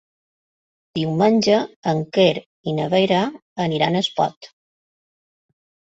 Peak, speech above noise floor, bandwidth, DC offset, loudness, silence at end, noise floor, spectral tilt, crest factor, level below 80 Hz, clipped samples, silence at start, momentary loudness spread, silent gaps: -2 dBFS; over 71 dB; 8 kHz; under 0.1%; -20 LUFS; 1.5 s; under -90 dBFS; -6 dB/octave; 20 dB; -60 dBFS; under 0.1%; 0.95 s; 9 LU; 1.76-1.83 s, 2.46-2.64 s, 3.42-3.56 s, 4.37-4.41 s